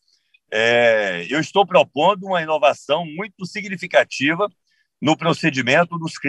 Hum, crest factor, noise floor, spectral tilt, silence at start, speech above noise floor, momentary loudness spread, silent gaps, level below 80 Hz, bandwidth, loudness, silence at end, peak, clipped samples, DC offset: none; 18 dB; -61 dBFS; -4.5 dB/octave; 0.5 s; 43 dB; 11 LU; none; -70 dBFS; 11 kHz; -19 LUFS; 0 s; -2 dBFS; under 0.1%; under 0.1%